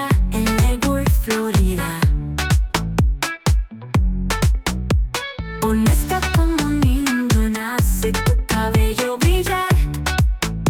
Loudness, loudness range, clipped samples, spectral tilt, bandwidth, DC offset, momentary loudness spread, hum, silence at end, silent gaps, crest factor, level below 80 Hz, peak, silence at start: -19 LUFS; 2 LU; under 0.1%; -5.5 dB/octave; 18.5 kHz; under 0.1%; 4 LU; none; 0 s; none; 12 dB; -22 dBFS; -4 dBFS; 0 s